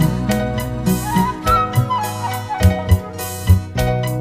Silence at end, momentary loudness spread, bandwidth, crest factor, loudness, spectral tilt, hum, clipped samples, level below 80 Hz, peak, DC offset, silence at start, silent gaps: 0 s; 7 LU; 16 kHz; 16 dB; -18 LUFS; -6 dB/octave; none; under 0.1%; -28 dBFS; 0 dBFS; under 0.1%; 0 s; none